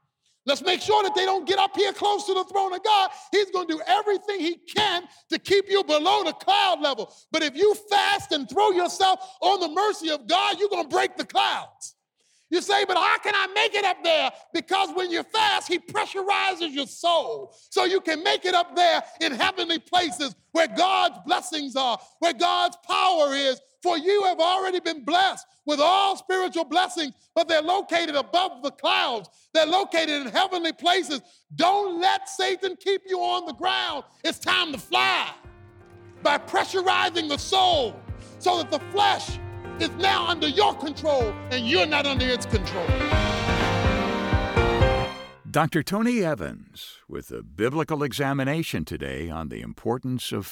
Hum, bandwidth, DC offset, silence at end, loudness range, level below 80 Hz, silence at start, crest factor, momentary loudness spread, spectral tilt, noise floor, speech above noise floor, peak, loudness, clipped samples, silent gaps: none; 18 kHz; under 0.1%; 0 s; 2 LU; -42 dBFS; 0.45 s; 18 dB; 9 LU; -4 dB/octave; -67 dBFS; 43 dB; -6 dBFS; -23 LUFS; under 0.1%; none